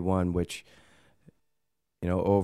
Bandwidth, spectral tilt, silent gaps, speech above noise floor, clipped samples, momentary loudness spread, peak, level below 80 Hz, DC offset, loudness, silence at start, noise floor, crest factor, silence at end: 13.5 kHz; -7.5 dB/octave; none; 55 dB; under 0.1%; 11 LU; -10 dBFS; -50 dBFS; under 0.1%; -30 LUFS; 0 s; -83 dBFS; 20 dB; 0 s